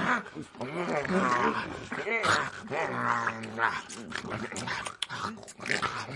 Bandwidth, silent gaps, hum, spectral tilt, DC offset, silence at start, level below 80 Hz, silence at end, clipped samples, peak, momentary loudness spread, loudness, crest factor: 11.5 kHz; none; none; -4 dB/octave; under 0.1%; 0 s; -64 dBFS; 0 s; under 0.1%; -12 dBFS; 11 LU; -31 LUFS; 20 dB